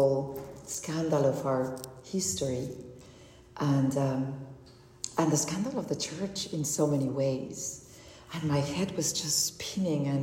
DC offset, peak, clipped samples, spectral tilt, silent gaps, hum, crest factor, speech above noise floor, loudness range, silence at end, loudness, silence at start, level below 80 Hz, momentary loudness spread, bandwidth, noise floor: under 0.1%; -14 dBFS; under 0.1%; -4.5 dB/octave; none; none; 18 dB; 23 dB; 2 LU; 0 s; -30 LUFS; 0 s; -62 dBFS; 15 LU; 16 kHz; -53 dBFS